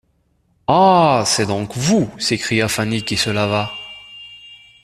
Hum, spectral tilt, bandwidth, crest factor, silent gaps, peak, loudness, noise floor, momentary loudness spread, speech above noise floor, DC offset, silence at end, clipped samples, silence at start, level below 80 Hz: none; -4 dB/octave; 14 kHz; 18 dB; none; 0 dBFS; -17 LUFS; -62 dBFS; 21 LU; 46 dB; under 0.1%; 0.3 s; under 0.1%; 0.7 s; -50 dBFS